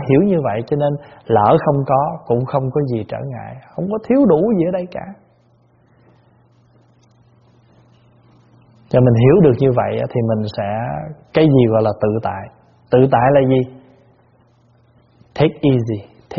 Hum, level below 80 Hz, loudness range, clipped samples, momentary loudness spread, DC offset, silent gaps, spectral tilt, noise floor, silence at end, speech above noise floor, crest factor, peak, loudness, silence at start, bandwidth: none; -48 dBFS; 5 LU; under 0.1%; 15 LU; under 0.1%; none; -7.5 dB/octave; -54 dBFS; 0 s; 39 dB; 18 dB; 0 dBFS; -16 LUFS; 0 s; 6 kHz